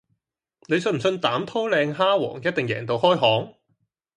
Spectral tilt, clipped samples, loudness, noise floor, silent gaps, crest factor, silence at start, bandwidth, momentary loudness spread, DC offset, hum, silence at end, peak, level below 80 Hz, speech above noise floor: -5.5 dB/octave; under 0.1%; -22 LUFS; -75 dBFS; none; 18 dB; 0.7 s; 11 kHz; 7 LU; under 0.1%; none; 0.65 s; -4 dBFS; -66 dBFS; 53 dB